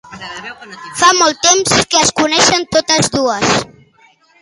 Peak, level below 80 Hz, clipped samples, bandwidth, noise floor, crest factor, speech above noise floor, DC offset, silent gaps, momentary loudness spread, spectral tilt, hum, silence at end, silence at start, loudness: 0 dBFS; -46 dBFS; under 0.1%; 12 kHz; -50 dBFS; 14 dB; 37 dB; under 0.1%; none; 19 LU; -2 dB/octave; none; 0.75 s; 0.1 s; -11 LUFS